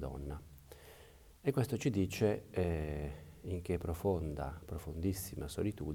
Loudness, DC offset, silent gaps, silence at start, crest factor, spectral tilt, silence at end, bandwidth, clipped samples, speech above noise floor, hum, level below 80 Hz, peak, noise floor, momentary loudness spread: -38 LUFS; under 0.1%; none; 0 s; 18 dB; -6.5 dB/octave; 0 s; 20 kHz; under 0.1%; 22 dB; none; -52 dBFS; -20 dBFS; -59 dBFS; 19 LU